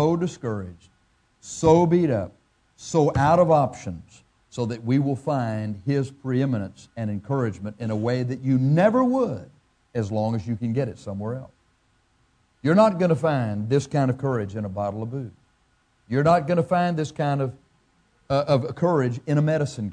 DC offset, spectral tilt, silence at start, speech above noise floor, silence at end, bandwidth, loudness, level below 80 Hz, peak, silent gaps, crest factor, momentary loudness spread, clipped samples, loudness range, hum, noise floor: under 0.1%; -7.5 dB/octave; 0 s; 42 dB; 0 s; 10 kHz; -23 LUFS; -54 dBFS; -4 dBFS; none; 20 dB; 14 LU; under 0.1%; 5 LU; none; -65 dBFS